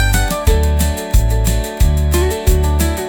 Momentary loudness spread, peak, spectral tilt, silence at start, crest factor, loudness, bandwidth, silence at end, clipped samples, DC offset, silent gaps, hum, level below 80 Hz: 2 LU; -2 dBFS; -5 dB/octave; 0 s; 12 dB; -16 LUFS; 19.5 kHz; 0 s; under 0.1%; under 0.1%; none; none; -16 dBFS